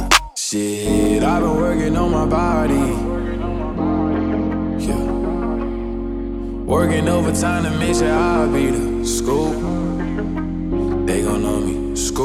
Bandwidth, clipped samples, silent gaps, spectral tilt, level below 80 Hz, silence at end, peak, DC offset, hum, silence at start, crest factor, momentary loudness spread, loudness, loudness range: 16.5 kHz; under 0.1%; none; -5 dB/octave; -28 dBFS; 0 s; 0 dBFS; under 0.1%; none; 0 s; 18 dB; 7 LU; -19 LUFS; 3 LU